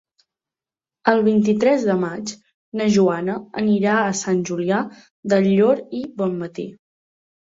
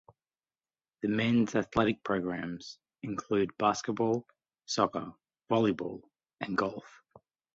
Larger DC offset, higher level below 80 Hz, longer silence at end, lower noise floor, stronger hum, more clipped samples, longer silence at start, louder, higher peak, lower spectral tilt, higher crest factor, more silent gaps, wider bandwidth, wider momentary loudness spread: neither; about the same, -62 dBFS vs -64 dBFS; about the same, 0.65 s vs 0.65 s; about the same, under -90 dBFS vs under -90 dBFS; neither; neither; about the same, 1.05 s vs 1.05 s; first, -20 LUFS vs -31 LUFS; first, 0 dBFS vs -12 dBFS; about the same, -6 dB/octave vs -5.5 dB/octave; about the same, 20 dB vs 22 dB; first, 2.54-2.72 s, 5.11-5.23 s vs none; about the same, 7.8 kHz vs 8 kHz; about the same, 14 LU vs 15 LU